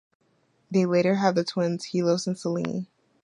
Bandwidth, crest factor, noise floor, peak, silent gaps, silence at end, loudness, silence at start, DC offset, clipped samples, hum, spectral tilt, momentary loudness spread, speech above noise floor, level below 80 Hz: 11 kHz; 20 dB; -67 dBFS; -6 dBFS; none; 0.4 s; -25 LUFS; 0.7 s; under 0.1%; under 0.1%; none; -6 dB/octave; 9 LU; 42 dB; -70 dBFS